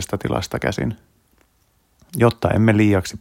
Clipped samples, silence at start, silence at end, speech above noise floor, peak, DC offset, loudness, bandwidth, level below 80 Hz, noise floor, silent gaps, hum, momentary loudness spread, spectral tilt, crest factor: under 0.1%; 0 s; 0.05 s; 43 dB; -2 dBFS; under 0.1%; -19 LUFS; 16.5 kHz; -44 dBFS; -62 dBFS; none; none; 12 LU; -6.5 dB/octave; 18 dB